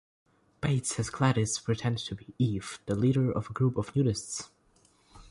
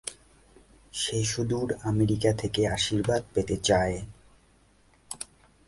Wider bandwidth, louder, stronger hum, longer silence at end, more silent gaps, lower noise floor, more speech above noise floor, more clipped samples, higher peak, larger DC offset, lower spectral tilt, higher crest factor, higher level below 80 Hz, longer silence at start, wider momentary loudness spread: about the same, 11.5 kHz vs 11.5 kHz; second, -30 LUFS vs -27 LUFS; neither; second, 0.1 s vs 0.45 s; neither; first, -65 dBFS vs -61 dBFS; about the same, 36 dB vs 35 dB; neither; about the same, -12 dBFS vs -10 dBFS; neither; about the same, -5.5 dB/octave vs -4.5 dB/octave; about the same, 18 dB vs 20 dB; second, -56 dBFS vs -48 dBFS; first, 0.6 s vs 0.05 s; second, 10 LU vs 15 LU